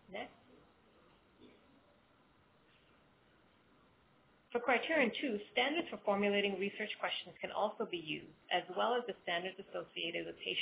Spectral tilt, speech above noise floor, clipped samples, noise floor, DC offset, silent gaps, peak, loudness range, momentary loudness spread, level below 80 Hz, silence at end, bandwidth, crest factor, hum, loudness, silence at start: -1.5 dB/octave; 32 dB; under 0.1%; -69 dBFS; under 0.1%; none; -18 dBFS; 5 LU; 11 LU; -78 dBFS; 0 s; 4 kHz; 22 dB; none; -37 LUFS; 0.1 s